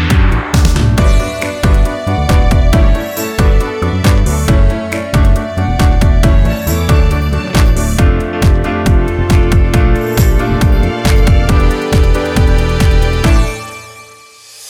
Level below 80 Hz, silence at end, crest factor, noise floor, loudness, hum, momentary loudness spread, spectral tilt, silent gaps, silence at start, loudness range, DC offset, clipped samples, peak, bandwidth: -12 dBFS; 0 s; 10 dB; -37 dBFS; -12 LUFS; none; 5 LU; -6 dB/octave; none; 0 s; 1 LU; under 0.1%; under 0.1%; 0 dBFS; 16.5 kHz